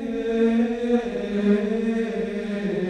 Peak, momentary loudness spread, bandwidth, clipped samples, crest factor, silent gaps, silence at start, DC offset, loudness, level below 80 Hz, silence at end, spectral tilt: -8 dBFS; 6 LU; 9.2 kHz; under 0.1%; 14 dB; none; 0 s; under 0.1%; -23 LUFS; -50 dBFS; 0 s; -7.5 dB/octave